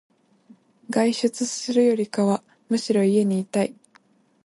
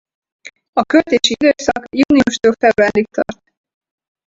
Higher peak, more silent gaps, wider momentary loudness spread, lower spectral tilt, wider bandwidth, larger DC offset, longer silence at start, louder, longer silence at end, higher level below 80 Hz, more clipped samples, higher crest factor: second, -6 dBFS vs 0 dBFS; second, none vs 0.69-0.73 s; about the same, 7 LU vs 9 LU; first, -5.5 dB/octave vs -4 dB/octave; first, 11.5 kHz vs 8 kHz; neither; first, 0.9 s vs 0.45 s; second, -23 LUFS vs -14 LUFS; second, 0.75 s vs 0.95 s; second, -72 dBFS vs -48 dBFS; neither; about the same, 18 dB vs 16 dB